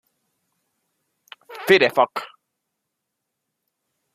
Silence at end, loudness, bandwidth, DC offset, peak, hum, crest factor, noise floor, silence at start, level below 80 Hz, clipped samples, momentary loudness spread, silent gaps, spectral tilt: 1.9 s; -18 LUFS; 15 kHz; under 0.1%; -2 dBFS; none; 24 dB; -80 dBFS; 1.5 s; -72 dBFS; under 0.1%; 18 LU; none; -4.5 dB/octave